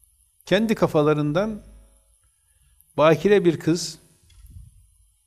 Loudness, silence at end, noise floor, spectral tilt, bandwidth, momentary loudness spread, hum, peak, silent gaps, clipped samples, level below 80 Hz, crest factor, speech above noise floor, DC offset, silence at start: -21 LUFS; 0.65 s; -62 dBFS; -6 dB/octave; 15 kHz; 13 LU; none; -4 dBFS; none; under 0.1%; -52 dBFS; 18 dB; 42 dB; under 0.1%; 0.45 s